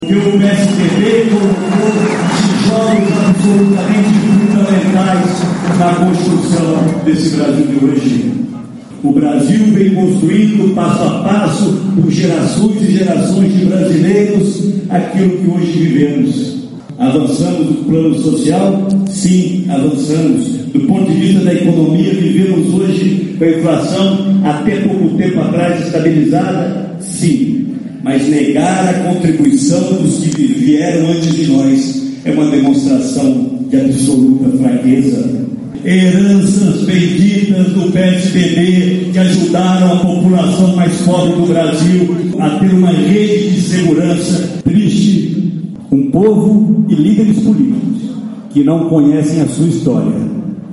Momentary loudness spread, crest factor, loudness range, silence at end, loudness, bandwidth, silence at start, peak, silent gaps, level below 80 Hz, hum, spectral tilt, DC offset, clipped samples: 5 LU; 10 dB; 2 LU; 0 s; -11 LUFS; 11.5 kHz; 0 s; 0 dBFS; none; -46 dBFS; none; -6.5 dB/octave; under 0.1%; under 0.1%